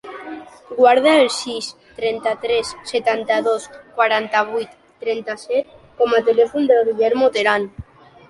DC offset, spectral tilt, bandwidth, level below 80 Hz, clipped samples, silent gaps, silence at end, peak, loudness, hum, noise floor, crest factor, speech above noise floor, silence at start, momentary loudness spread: under 0.1%; -3.5 dB/octave; 11.5 kHz; -54 dBFS; under 0.1%; none; 0.5 s; -2 dBFS; -18 LUFS; none; -38 dBFS; 16 dB; 21 dB; 0.05 s; 16 LU